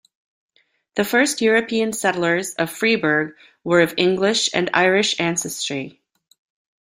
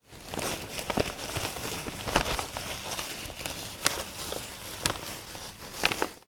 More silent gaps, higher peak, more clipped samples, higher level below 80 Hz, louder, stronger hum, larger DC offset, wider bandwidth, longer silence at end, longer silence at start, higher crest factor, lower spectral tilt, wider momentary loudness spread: neither; about the same, -2 dBFS vs 0 dBFS; neither; second, -62 dBFS vs -48 dBFS; first, -19 LUFS vs -32 LUFS; neither; neither; second, 16 kHz vs 19.5 kHz; first, 0.9 s vs 0.05 s; first, 0.95 s vs 0.1 s; second, 20 dB vs 34 dB; about the same, -3.5 dB/octave vs -2.5 dB/octave; about the same, 9 LU vs 10 LU